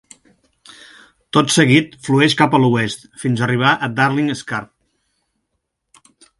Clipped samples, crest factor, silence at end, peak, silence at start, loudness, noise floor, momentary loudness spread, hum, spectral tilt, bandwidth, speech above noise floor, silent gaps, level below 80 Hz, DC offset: under 0.1%; 18 dB; 1.75 s; 0 dBFS; 1.35 s; -16 LUFS; -74 dBFS; 11 LU; none; -5 dB/octave; 11.5 kHz; 58 dB; none; -56 dBFS; under 0.1%